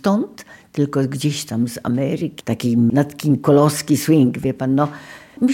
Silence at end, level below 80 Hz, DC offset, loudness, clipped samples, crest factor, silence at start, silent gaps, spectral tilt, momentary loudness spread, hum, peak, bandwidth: 0 s; -56 dBFS; under 0.1%; -18 LUFS; under 0.1%; 16 dB; 0.05 s; none; -6.5 dB/octave; 9 LU; none; -2 dBFS; 17 kHz